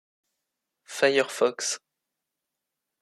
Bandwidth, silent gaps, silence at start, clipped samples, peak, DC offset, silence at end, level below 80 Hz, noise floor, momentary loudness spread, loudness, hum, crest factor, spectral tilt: 14 kHz; none; 0.9 s; under 0.1%; -6 dBFS; under 0.1%; 1.25 s; -84 dBFS; -85 dBFS; 12 LU; -25 LUFS; none; 24 dB; -1.5 dB/octave